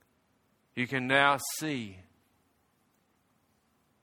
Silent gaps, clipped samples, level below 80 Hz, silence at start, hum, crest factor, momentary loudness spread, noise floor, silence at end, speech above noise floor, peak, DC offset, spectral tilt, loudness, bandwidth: none; under 0.1%; -74 dBFS; 0.75 s; none; 26 dB; 17 LU; -72 dBFS; 2 s; 42 dB; -8 dBFS; under 0.1%; -3.5 dB/octave; -29 LUFS; 18.5 kHz